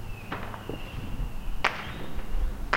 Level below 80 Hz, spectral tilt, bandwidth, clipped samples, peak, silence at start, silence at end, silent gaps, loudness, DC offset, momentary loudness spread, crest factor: -34 dBFS; -5 dB/octave; 16 kHz; under 0.1%; -4 dBFS; 0 s; 0 s; none; -35 LUFS; under 0.1%; 9 LU; 26 dB